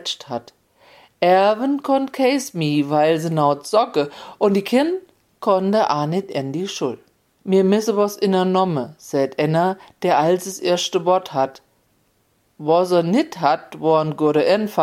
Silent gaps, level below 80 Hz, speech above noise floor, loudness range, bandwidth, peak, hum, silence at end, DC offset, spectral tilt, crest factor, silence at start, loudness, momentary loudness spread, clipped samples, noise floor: none; -68 dBFS; 45 dB; 2 LU; 16 kHz; -2 dBFS; none; 0 s; under 0.1%; -5.5 dB/octave; 16 dB; 0 s; -19 LUFS; 9 LU; under 0.1%; -63 dBFS